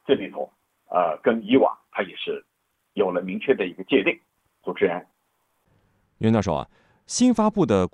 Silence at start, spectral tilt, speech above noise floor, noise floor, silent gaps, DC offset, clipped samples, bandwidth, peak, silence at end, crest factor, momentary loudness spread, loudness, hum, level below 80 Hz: 0.1 s; -5.5 dB/octave; 49 dB; -71 dBFS; none; under 0.1%; under 0.1%; 11 kHz; -6 dBFS; 0.05 s; 18 dB; 15 LU; -23 LUFS; none; -56 dBFS